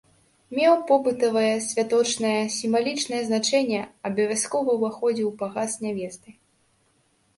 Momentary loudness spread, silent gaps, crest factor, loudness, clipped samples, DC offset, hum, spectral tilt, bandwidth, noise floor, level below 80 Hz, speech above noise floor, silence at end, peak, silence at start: 9 LU; none; 18 dB; -24 LUFS; under 0.1%; under 0.1%; none; -3.5 dB/octave; 11.5 kHz; -66 dBFS; -70 dBFS; 42 dB; 1.05 s; -6 dBFS; 0.5 s